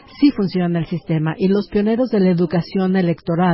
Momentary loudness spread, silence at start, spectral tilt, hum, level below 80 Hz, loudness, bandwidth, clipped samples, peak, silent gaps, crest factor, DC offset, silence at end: 4 LU; 0.15 s; -12.5 dB/octave; none; -48 dBFS; -18 LUFS; 5.8 kHz; under 0.1%; -4 dBFS; none; 14 dB; under 0.1%; 0 s